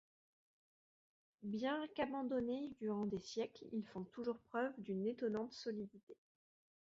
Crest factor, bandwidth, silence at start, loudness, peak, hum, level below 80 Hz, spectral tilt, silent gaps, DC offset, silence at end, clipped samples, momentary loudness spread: 18 dB; 7.6 kHz; 1.4 s; -44 LUFS; -26 dBFS; none; -78 dBFS; -5 dB/octave; 6.03-6.07 s; under 0.1%; 0.7 s; under 0.1%; 7 LU